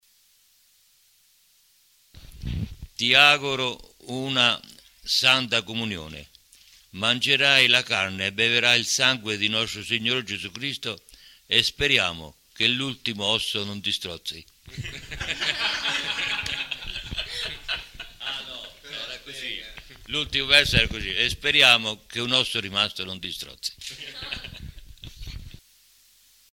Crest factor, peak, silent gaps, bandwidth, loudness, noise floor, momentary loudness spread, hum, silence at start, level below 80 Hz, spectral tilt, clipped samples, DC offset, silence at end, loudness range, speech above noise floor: 22 dB; -4 dBFS; none; 17 kHz; -22 LUFS; -61 dBFS; 20 LU; none; 2.15 s; -46 dBFS; -2 dB/octave; under 0.1%; under 0.1%; 0.95 s; 11 LU; 37 dB